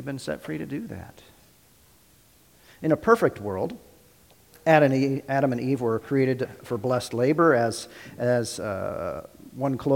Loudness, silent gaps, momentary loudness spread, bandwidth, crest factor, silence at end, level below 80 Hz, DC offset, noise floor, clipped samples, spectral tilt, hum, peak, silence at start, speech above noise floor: -25 LUFS; none; 14 LU; 17 kHz; 22 dB; 0 s; -60 dBFS; under 0.1%; -58 dBFS; under 0.1%; -6.5 dB/octave; none; -4 dBFS; 0 s; 33 dB